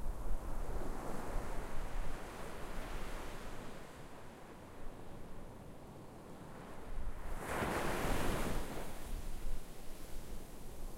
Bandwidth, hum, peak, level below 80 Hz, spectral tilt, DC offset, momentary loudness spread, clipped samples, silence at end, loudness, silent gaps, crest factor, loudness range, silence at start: 16 kHz; none; -22 dBFS; -44 dBFS; -5 dB/octave; under 0.1%; 16 LU; under 0.1%; 0 s; -46 LUFS; none; 16 dB; 11 LU; 0 s